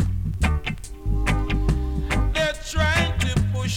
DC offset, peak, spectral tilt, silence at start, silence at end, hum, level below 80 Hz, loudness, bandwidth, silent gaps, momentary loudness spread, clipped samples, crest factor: under 0.1%; -6 dBFS; -5 dB/octave; 0 s; 0 s; none; -26 dBFS; -24 LUFS; 15.5 kHz; none; 6 LU; under 0.1%; 16 dB